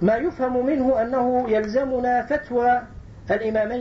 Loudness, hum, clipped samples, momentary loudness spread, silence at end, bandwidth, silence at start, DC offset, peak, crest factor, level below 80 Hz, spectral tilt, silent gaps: -22 LUFS; none; under 0.1%; 4 LU; 0 s; 7.2 kHz; 0 s; under 0.1%; -8 dBFS; 12 dB; -46 dBFS; -8 dB/octave; none